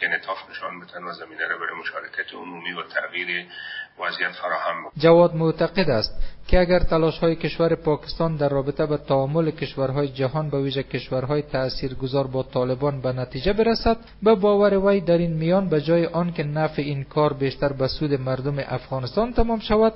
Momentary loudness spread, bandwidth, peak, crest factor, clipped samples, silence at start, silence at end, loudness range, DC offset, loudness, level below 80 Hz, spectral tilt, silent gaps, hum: 11 LU; 5.8 kHz; -2 dBFS; 20 dB; under 0.1%; 0 s; 0 s; 8 LU; under 0.1%; -23 LUFS; -36 dBFS; -5 dB/octave; none; none